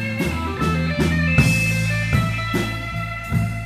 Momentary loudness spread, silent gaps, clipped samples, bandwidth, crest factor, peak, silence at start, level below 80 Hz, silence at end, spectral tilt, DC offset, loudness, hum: 8 LU; none; under 0.1%; 16 kHz; 16 dB; -4 dBFS; 0 s; -32 dBFS; 0 s; -5.5 dB/octave; under 0.1%; -20 LUFS; none